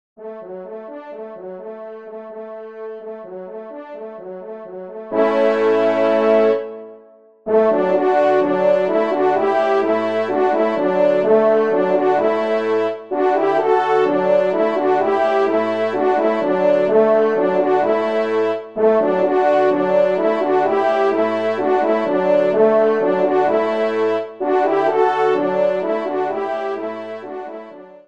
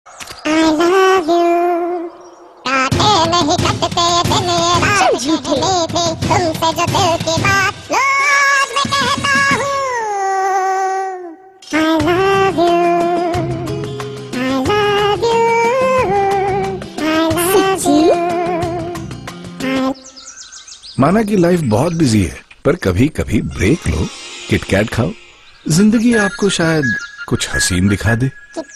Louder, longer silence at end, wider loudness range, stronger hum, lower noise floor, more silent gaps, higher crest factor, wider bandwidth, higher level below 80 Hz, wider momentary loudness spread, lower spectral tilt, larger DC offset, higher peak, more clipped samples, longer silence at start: second, -17 LUFS vs -14 LUFS; first, 0.2 s vs 0 s; first, 8 LU vs 3 LU; neither; first, -47 dBFS vs -38 dBFS; neither; about the same, 14 dB vs 14 dB; second, 7.8 kHz vs 13.5 kHz; second, -70 dBFS vs -36 dBFS; first, 18 LU vs 12 LU; first, -7 dB/octave vs -4.5 dB/octave; first, 0.3% vs under 0.1%; second, -4 dBFS vs 0 dBFS; neither; first, 0.2 s vs 0.05 s